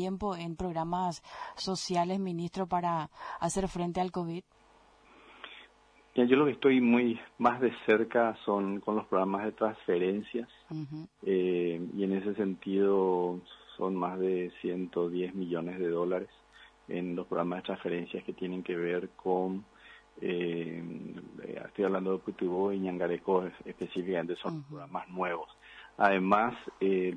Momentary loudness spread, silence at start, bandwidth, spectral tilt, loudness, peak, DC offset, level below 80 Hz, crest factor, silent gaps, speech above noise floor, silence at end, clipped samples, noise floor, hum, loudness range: 15 LU; 0 s; 10.5 kHz; -6 dB/octave; -32 LUFS; -12 dBFS; under 0.1%; -62 dBFS; 20 dB; none; 31 dB; 0 s; under 0.1%; -62 dBFS; none; 7 LU